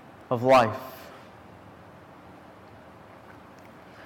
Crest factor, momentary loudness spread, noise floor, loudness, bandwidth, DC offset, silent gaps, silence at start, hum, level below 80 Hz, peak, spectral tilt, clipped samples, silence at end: 18 dB; 29 LU; -49 dBFS; -23 LUFS; 18 kHz; under 0.1%; none; 0.3 s; none; -62 dBFS; -12 dBFS; -6 dB/octave; under 0.1%; 3.05 s